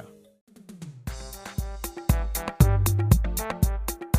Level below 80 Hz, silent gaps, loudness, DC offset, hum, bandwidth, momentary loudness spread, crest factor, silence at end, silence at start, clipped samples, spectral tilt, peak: -30 dBFS; 0.41-0.47 s; -26 LUFS; under 0.1%; none; 16 kHz; 17 LU; 20 dB; 0 s; 0 s; under 0.1%; -6 dB/octave; -6 dBFS